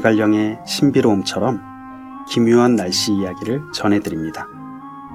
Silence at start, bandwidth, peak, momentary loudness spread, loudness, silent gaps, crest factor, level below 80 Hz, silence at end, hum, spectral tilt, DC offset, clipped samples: 0 s; 15.5 kHz; -2 dBFS; 20 LU; -18 LUFS; none; 18 dB; -54 dBFS; 0 s; none; -5 dB/octave; under 0.1%; under 0.1%